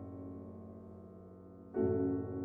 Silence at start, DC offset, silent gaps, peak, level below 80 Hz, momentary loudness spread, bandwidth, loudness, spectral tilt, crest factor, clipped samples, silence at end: 0 s; under 0.1%; none; -22 dBFS; -68 dBFS; 21 LU; 2.6 kHz; -38 LUFS; -12 dB/octave; 18 dB; under 0.1%; 0 s